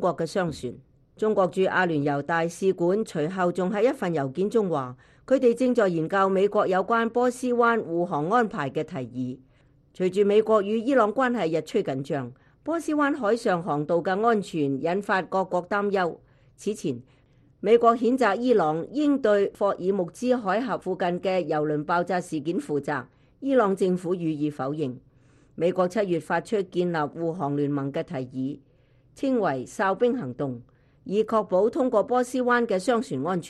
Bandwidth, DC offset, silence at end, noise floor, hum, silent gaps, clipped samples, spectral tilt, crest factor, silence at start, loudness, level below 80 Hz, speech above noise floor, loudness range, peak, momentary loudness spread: 12.5 kHz; under 0.1%; 0 s; -58 dBFS; none; none; under 0.1%; -6.5 dB/octave; 18 dB; 0 s; -25 LUFS; -64 dBFS; 34 dB; 4 LU; -6 dBFS; 10 LU